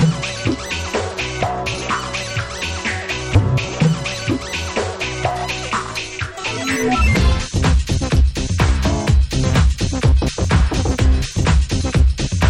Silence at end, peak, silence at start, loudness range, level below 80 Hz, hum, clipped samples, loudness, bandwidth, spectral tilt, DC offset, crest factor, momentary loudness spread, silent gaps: 0 s; 0 dBFS; 0 s; 4 LU; -20 dBFS; none; under 0.1%; -19 LUFS; 12.5 kHz; -5 dB/octave; under 0.1%; 16 dB; 6 LU; none